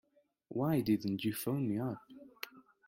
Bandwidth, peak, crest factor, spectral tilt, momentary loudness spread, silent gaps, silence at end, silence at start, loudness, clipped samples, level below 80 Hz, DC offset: 16.5 kHz; -20 dBFS; 18 dB; -6.5 dB/octave; 16 LU; none; 0.25 s; 0.5 s; -35 LUFS; under 0.1%; -72 dBFS; under 0.1%